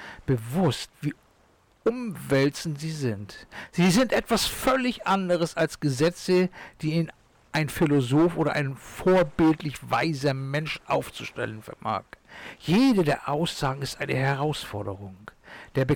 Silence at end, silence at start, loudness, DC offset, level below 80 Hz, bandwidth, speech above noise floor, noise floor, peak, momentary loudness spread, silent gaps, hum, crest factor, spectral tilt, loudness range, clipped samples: 0 s; 0 s; -26 LUFS; under 0.1%; -52 dBFS; 19 kHz; 36 dB; -61 dBFS; -14 dBFS; 12 LU; none; none; 10 dB; -5.5 dB/octave; 4 LU; under 0.1%